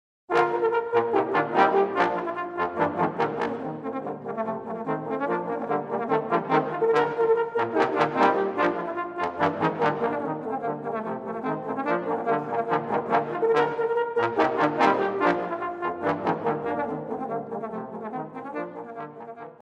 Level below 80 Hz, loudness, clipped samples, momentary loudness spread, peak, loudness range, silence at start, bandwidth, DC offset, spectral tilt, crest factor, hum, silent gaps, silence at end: -66 dBFS; -26 LUFS; under 0.1%; 11 LU; -4 dBFS; 5 LU; 0.3 s; 8 kHz; under 0.1%; -7 dB/octave; 20 dB; none; none; 0.1 s